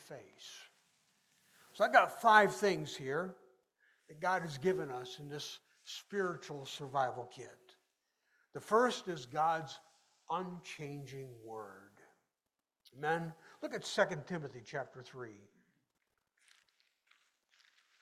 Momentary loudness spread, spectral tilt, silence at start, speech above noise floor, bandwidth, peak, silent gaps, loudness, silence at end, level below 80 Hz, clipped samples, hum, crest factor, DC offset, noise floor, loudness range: 23 LU; -4.5 dB/octave; 0 s; over 54 dB; 16 kHz; -12 dBFS; none; -35 LUFS; 2.65 s; -80 dBFS; under 0.1%; none; 26 dB; under 0.1%; under -90 dBFS; 12 LU